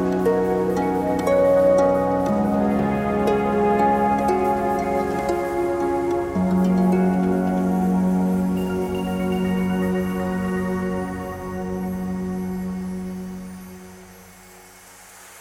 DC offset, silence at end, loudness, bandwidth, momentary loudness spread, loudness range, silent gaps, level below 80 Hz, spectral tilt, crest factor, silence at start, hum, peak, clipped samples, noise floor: under 0.1%; 0 s; -21 LUFS; 16 kHz; 11 LU; 10 LU; none; -44 dBFS; -8 dB/octave; 14 dB; 0 s; none; -6 dBFS; under 0.1%; -45 dBFS